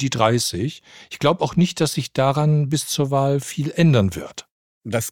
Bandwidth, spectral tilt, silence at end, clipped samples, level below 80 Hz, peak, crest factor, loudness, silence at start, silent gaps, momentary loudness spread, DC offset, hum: 18 kHz; -5.5 dB/octave; 0 s; under 0.1%; -52 dBFS; -2 dBFS; 18 dB; -20 LUFS; 0 s; 4.51-4.81 s; 16 LU; 0.1%; none